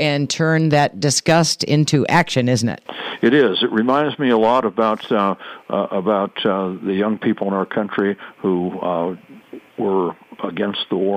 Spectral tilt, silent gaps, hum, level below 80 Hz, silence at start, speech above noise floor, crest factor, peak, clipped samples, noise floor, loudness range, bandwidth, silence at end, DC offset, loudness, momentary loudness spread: -5 dB/octave; none; none; -60 dBFS; 0 s; 22 dB; 14 dB; -4 dBFS; under 0.1%; -40 dBFS; 6 LU; 15 kHz; 0 s; under 0.1%; -18 LUFS; 10 LU